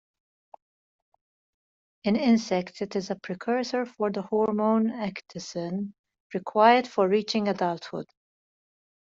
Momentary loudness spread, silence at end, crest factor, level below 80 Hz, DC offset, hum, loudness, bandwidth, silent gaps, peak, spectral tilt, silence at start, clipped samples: 15 LU; 1 s; 22 dB; -72 dBFS; under 0.1%; none; -26 LUFS; 7.6 kHz; 5.99-6.04 s, 6.20-6.30 s; -6 dBFS; -5.5 dB/octave; 2.05 s; under 0.1%